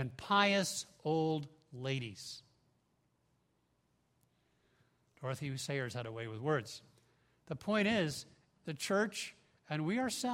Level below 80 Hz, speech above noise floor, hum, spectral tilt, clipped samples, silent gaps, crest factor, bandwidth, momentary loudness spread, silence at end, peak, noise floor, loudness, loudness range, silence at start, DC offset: -74 dBFS; 41 dB; none; -4.5 dB/octave; under 0.1%; none; 24 dB; 16 kHz; 16 LU; 0 s; -14 dBFS; -77 dBFS; -36 LUFS; 12 LU; 0 s; under 0.1%